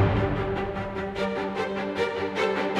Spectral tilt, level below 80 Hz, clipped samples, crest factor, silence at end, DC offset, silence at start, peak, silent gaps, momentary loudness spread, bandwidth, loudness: -7 dB/octave; -42 dBFS; under 0.1%; 16 dB; 0 s; under 0.1%; 0 s; -10 dBFS; none; 5 LU; 11 kHz; -28 LUFS